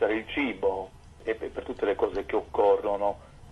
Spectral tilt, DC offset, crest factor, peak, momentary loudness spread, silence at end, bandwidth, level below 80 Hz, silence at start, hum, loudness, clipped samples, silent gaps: -6 dB/octave; under 0.1%; 16 dB; -12 dBFS; 13 LU; 0 s; 11 kHz; -52 dBFS; 0 s; none; -28 LUFS; under 0.1%; none